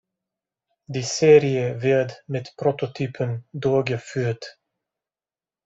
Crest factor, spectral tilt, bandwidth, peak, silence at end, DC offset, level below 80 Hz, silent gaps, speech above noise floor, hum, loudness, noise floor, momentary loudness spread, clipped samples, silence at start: 20 dB; -5.5 dB/octave; 8 kHz; -4 dBFS; 1.15 s; under 0.1%; -62 dBFS; none; over 68 dB; none; -22 LUFS; under -90 dBFS; 16 LU; under 0.1%; 0.9 s